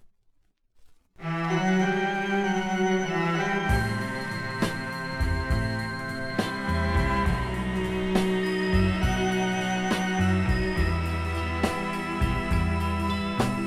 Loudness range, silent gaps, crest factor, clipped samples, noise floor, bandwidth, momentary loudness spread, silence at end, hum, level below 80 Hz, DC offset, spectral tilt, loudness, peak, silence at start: 3 LU; none; 16 dB; under 0.1%; -65 dBFS; 14.5 kHz; 6 LU; 0 s; none; -34 dBFS; under 0.1%; -6 dB/octave; -27 LUFS; -10 dBFS; 0.05 s